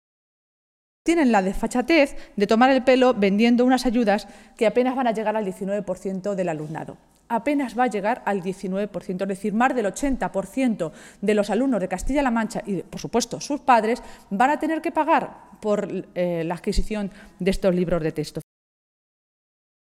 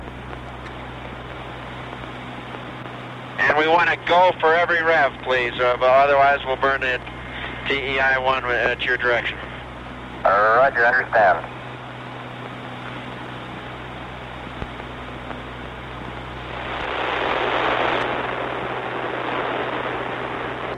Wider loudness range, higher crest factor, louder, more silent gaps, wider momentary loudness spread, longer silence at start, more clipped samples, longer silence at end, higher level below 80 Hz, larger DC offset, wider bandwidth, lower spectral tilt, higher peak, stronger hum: second, 7 LU vs 15 LU; about the same, 18 dB vs 16 dB; second, -23 LUFS vs -20 LUFS; neither; second, 11 LU vs 18 LU; first, 1.05 s vs 0 s; neither; first, 1.4 s vs 0 s; about the same, -40 dBFS vs -44 dBFS; neither; first, 14.5 kHz vs 10.5 kHz; about the same, -5.5 dB/octave vs -5.5 dB/octave; about the same, -4 dBFS vs -6 dBFS; neither